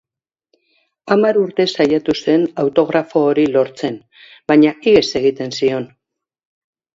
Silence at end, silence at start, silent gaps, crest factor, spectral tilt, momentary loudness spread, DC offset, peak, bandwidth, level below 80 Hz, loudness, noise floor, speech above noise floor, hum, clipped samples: 1.1 s; 1.05 s; none; 16 dB; -5.5 dB/octave; 12 LU; under 0.1%; 0 dBFS; 7.8 kHz; -54 dBFS; -15 LUFS; -67 dBFS; 52 dB; none; under 0.1%